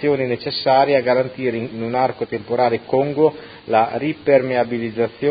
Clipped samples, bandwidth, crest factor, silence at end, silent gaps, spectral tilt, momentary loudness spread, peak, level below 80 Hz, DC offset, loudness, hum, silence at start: under 0.1%; 5 kHz; 18 dB; 0 s; none; -11 dB/octave; 7 LU; -2 dBFS; -56 dBFS; under 0.1%; -19 LUFS; none; 0 s